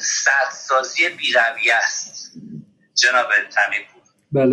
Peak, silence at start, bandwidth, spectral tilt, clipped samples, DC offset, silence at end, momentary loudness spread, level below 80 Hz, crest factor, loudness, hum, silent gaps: -4 dBFS; 0 s; 12 kHz; -2 dB/octave; under 0.1%; under 0.1%; 0 s; 17 LU; -70 dBFS; 16 dB; -17 LUFS; none; none